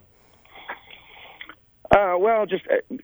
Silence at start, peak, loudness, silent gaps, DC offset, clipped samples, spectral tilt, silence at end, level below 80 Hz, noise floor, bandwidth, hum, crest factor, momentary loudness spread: 0.55 s; 0 dBFS; -21 LUFS; none; under 0.1%; under 0.1%; -7 dB/octave; 0.05 s; -50 dBFS; -56 dBFS; over 20 kHz; none; 24 dB; 24 LU